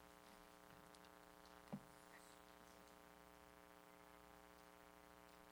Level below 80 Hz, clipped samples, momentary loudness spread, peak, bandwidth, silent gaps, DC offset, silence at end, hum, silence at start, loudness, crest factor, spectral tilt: -80 dBFS; under 0.1%; 7 LU; -40 dBFS; over 20 kHz; none; under 0.1%; 0 s; none; 0 s; -64 LUFS; 24 dB; -4 dB/octave